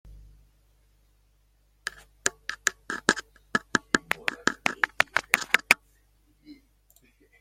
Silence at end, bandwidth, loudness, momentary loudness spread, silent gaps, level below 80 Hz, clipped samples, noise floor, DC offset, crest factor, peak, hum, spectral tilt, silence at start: 0.85 s; 16.5 kHz; -26 LUFS; 9 LU; none; -60 dBFS; under 0.1%; -65 dBFS; under 0.1%; 30 dB; 0 dBFS; 50 Hz at -60 dBFS; -1.5 dB/octave; 2.25 s